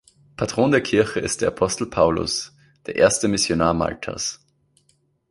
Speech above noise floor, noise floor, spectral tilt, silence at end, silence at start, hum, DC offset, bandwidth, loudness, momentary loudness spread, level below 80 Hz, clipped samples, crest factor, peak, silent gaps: 44 dB; -65 dBFS; -4 dB/octave; 0.95 s; 0.4 s; none; under 0.1%; 11.5 kHz; -21 LUFS; 10 LU; -46 dBFS; under 0.1%; 20 dB; -2 dBFS; none